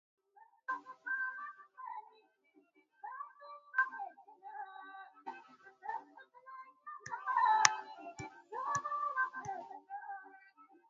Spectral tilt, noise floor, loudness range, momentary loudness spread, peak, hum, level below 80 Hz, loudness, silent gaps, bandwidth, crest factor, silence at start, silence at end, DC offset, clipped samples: 1 dB/octave; -71 dBFS; 10 LU; 21 LU; -2 dBFS; none; -82 dBFS; -38 LUFS; none; 7.4 kHz; 40 dB; 0.4 s; 0.25 s; under 0.1%; under 0.1%